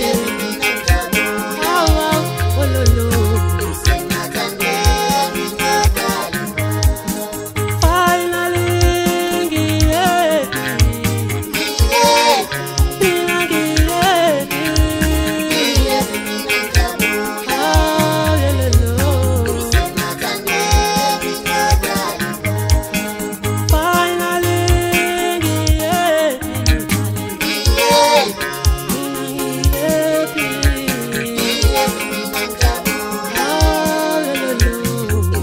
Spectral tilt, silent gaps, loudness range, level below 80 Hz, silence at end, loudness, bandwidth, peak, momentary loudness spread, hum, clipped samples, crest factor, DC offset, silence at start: -4.5 dB/octave; none; 2 LU; -22 dBFS; 0 s; -16 LUFS; 16.5 kHz; 0 dBFS; 6 LU; none; under 0.1%; 16 dB; under 0.1%; 0 s